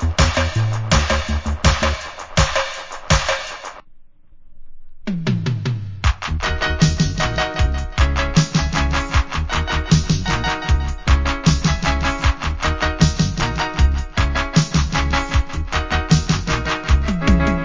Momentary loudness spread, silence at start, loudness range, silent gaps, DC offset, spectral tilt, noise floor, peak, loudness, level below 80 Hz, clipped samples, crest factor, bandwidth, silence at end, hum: 5 LU; 0 s; 4 LU; none; under 0.1%; -5 dB/octave; -41 dBFS; 0 dBFS; -19 LUFS; -22 dBFS; under 0.1%; 18 dB; 7.6 kHz; 0 s; none